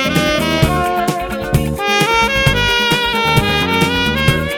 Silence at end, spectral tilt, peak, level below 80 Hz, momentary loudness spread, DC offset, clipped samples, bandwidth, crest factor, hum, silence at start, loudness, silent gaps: 0 s; -4.5 dB/octave; 0 dBFS; -28 dBFS; 5 LU; under 0.1%; under 0.1%; over 20 kHz; 14 dB; none; 0 s; -14 LUFS; none